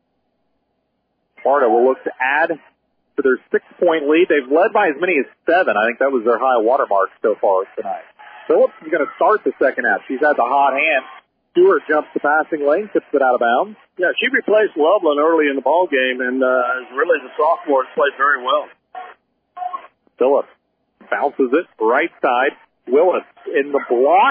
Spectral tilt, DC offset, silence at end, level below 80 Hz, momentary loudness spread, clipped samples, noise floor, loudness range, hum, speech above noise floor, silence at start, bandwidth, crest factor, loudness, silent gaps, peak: -7.5 dB/octave; under 0.1%; 0 s; -72 dBFS; 8 LU; under 0.1%; -69 dBFS; 4 LU; none; 53 dB; 1.45 s; 5 kHz; 14 dB; -17 LUFS; none; -4 dBFS